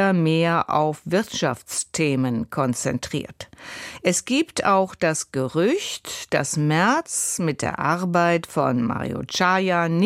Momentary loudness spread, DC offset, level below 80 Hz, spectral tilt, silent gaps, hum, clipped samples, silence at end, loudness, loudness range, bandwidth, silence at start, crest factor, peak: 8 LU; under 0.1%; -56 dBFS; -4.5 dB/octave; none; none; under 0.1%; 0 s; -22 LUFS; 3 LU; 16 kHz; 0 s; 16 dB; -6 dBFS